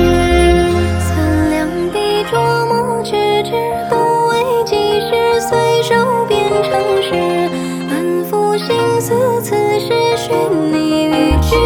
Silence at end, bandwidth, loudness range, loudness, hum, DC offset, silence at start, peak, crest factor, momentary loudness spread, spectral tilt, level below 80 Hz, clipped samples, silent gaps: 0 s; 19 kHz; 1 LU; -14 LUFS; none; under 0.1%; 0 s; 0 dBFS; 14 dB; 4 LU; -5.5 dB/octave; -26 dBFS; under 0.1%; none